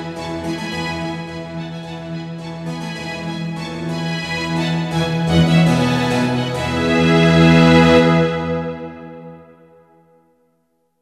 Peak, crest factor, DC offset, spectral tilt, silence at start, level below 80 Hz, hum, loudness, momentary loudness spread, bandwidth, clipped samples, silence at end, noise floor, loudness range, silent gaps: 0 dBFS; 18 dB; under 0.1%; -6.5 dB/octave; 0 s; -40 dBFS; none; -17 LUFS; 18 LU; 11.5 kHz; under 0.1%; 1.6 s; -65 dBFS; 12 LU; none